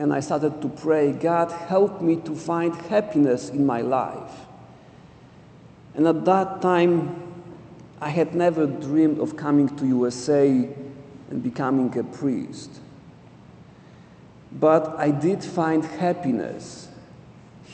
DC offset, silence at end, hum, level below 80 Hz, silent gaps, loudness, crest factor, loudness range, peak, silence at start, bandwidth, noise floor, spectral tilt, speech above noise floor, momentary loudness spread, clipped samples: under 0.1%; 0 s; none; -62 dBFS; none; -23 LUFS; 20 dB; 4 LU; -4 dBFS; 0 s; 9 kHz; -48 dBFS; -7 dB/octave; 26 dB; 19 LU; under 0.1%